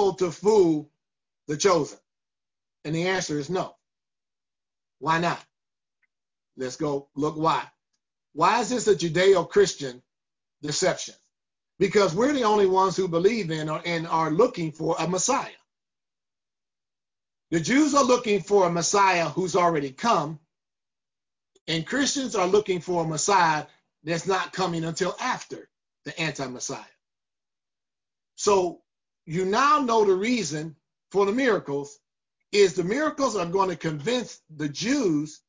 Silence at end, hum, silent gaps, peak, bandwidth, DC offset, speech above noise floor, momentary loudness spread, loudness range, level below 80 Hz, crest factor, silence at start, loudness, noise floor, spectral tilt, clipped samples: 0.1 s; none; 21.61-21.66 s; -8 dBFS; 7.6 kHz; under 0.1%; over 66 dB; 14 LU; 7 LU; -64 dBFS; 18 dB; 0 s; -24 LUFS; under -90 dBFS; -4 dB/octave; under 0.1%